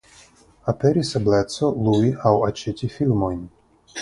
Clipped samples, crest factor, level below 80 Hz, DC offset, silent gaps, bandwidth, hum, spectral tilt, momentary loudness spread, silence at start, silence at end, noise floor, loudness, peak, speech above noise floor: under 0.1%; 20 dB; -46 dBFS; under 0.1%; none; 11.5 kHz; none; -7 dB/octave; 9 LU; 0.65 s; 0 s; -51 dBFS; -21 LUFS; -2 dBFS; 31 dB